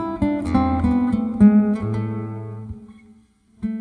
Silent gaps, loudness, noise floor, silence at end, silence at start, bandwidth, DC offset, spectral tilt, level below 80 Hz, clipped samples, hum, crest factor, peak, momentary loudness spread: none; -19 LUFS; -54 dBFS; 0 s; 0 s; 9.8 kHz; under 0.1%; -9.5 dB/octave; -38 dBFS; under 0.1%; none; 18 dB; -2 dBFS; 19 LU